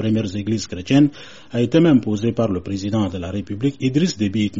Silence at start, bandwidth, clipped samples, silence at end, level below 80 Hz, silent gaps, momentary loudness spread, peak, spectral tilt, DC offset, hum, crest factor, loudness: 0 s; 8 kHz; under 0.1%; 0 s; -50 dBFS; none; 9 LU; -4 dBFS; -7 dB/octave; 0.6%; none; 16 dB; -20 LUFS